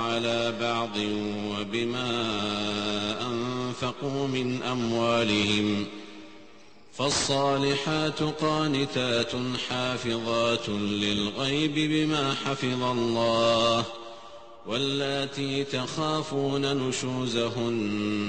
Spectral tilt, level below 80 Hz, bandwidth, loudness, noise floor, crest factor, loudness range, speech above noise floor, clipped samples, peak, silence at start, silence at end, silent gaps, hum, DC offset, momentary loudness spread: -4.5 dB/octave; -58 dBFS; 8.8 kHz; -27 LUFS; -54 dBFS; 16 dB; 3 LU; 26 dB; under 0.1%; -12 dBFS; 0 s; 0 s; none; none; 0.3%; 7 LU